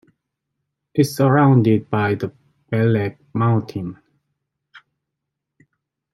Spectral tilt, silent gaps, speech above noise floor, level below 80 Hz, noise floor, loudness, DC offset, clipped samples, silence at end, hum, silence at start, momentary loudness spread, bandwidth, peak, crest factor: -8 dB/octave; none; 64 dB; -60 dBFS; -81 dBFS; -19 LUFS; under 0.1%; under 0.1%; 1.35 s; none; 0.95 s; 15 LU; 13.5 kHz; -2 dBFS; 18 dB